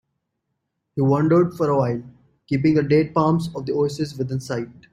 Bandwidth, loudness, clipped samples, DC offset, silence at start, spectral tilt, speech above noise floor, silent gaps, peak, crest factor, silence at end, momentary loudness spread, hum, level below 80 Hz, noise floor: 12.5 kHz; -21 LUFS; under 0.1%; under 0.1%; 0.95 s; -8 dB/octave; 57 dB; none; -4 dBFS; 18 dB; 0.2 s; 11 LU; none; -56 dBFS; -77 dBFS